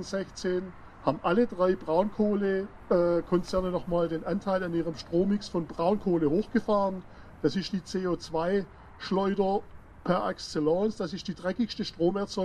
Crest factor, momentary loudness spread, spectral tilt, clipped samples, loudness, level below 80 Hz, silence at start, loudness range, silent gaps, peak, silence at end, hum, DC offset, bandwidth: 18 dB; 7 LU; -6.5 dB/octave; under 0.1%; -29 LUFS; -52 dBFS; 0 s; 3 LU; none; -10 dBFS; 0 s; none; under 0.1%; 11 kHz